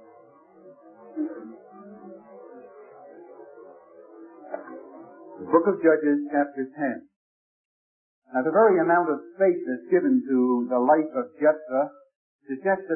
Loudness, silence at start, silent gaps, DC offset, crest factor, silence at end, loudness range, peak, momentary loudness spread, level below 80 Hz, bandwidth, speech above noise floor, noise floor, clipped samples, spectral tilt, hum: -23 LUFS; 0.65 s; 7.16-8.22 s, 12.15-12.39 s; under 0.1%; 20 dB; 0 s; 21 LU; -6 dBFS; 25 LU; -84 dBFS; 2.7 kHz; 30 dB; -53 dBFS; under 0.1%; -13 dB/octave; none